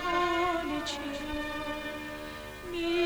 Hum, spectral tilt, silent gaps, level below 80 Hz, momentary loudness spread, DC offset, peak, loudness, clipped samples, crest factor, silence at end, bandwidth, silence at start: none; -4 dB/octave; none; -50 dBFS; 12 LU; under 0.1%; -16 dBFS; -33 LUFS; under 0.1%; 16 dB; 0 s; over 20 kHz; 0 s